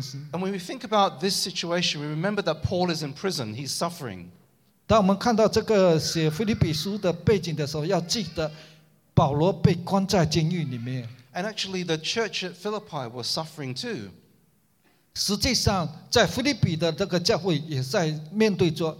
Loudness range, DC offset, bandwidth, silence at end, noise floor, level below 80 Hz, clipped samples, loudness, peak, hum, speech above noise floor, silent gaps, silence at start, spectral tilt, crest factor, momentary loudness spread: 6 LU; under 0.1%; 16.5 kHz; 0 s; -64 dBFS; -48 dBFS; under 0.1%; -25 LUFS; -4 dBFS; none; 39 dB; none; 0 s; -5 dB/octave; 20 dB; 11 LU